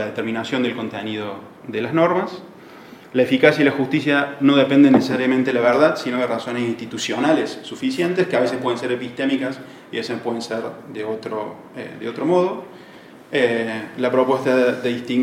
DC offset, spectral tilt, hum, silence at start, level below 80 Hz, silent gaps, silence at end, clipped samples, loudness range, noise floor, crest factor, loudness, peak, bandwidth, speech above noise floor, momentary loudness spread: under 0.1%; -5.5 dB/octave; none; 0 s; -66 dBFS; none; 0 s; under 0.1%; 9 LU; -43 dBFS; 20 dB; -20 LUFS; 0 dBFS; 14 kHz; 23 dB; 15 LU